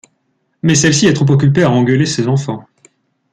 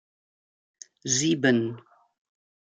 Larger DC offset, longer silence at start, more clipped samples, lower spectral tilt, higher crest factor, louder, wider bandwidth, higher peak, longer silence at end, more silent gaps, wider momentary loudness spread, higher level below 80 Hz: neither; second, 0.65 s vs 1.05 s; neither; first, -5 dB/octave vs -3.5 dB/octave; second, 14 dB vs 22 dB; first, -12 LUFS vs -24 LUFS; about the same, 9.4 kHz vs 10 kHz; first, 0 dBFS vs -8 dBFS; second, 0.7 s vs 0.95 s; neither; second, 8 LU vs 16 LU; first, -48 dBFS vs -72 dBFS